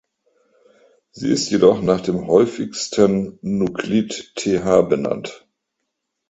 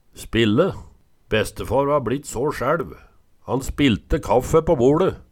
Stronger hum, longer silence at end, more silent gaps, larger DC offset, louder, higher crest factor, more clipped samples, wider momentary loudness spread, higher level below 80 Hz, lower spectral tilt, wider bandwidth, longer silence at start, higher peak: neither; first, 0.9 s vs 0.15 s; neither; neither; about the same, -19 LUFS vs -21 LUFS; about the same, 20 dB vs 16 dB; neither; about the same, 10 LU vs 9 LU; second, -52 dBFS vs -36 dBFS; about the same, -5.5 dB/octave vs -6 dB/octave; second, 8.2 kHz vs 17 kHz; first, 1.15 s vs 0.2 s; first, 0 dBFS vs -4 dBFS